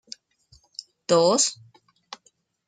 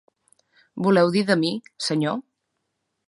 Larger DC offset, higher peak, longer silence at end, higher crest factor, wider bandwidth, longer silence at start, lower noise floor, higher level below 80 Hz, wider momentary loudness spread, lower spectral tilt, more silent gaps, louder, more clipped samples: neither; about the same, -6 dBFS vs -4 dBFS; first, 1.15 s vs 0.85 s; about the same, 22 dB vs 20 dB; second, 9.8 kHz vs 11.5 kHz; first, 1.1 s vs 0.75 s; second, -65 dBFS vs -77 dBFS; about the same, -72 dBFS vs -70 dBFS; first, 25 LU vs 11 LU; second, -3 dB/octave vs -5.5 dB/octave; neither; about the same, -21 LUFS vs -22 LUFS; neither